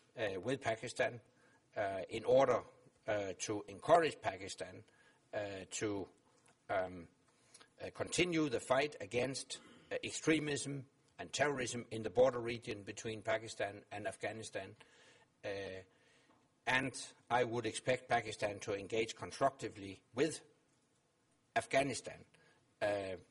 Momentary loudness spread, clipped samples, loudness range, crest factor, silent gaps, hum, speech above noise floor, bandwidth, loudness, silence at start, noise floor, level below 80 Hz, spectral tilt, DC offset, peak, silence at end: 15 LU; under 0.1%; 8 LU; 24 dB; none; none; 38 dB; 11.5 kHz; -39 LUFS; 0.15 s; -77 dBFS; -72 dBFS; -4 dB/octave; under 0.1%; -16 dBFS; 0.1 s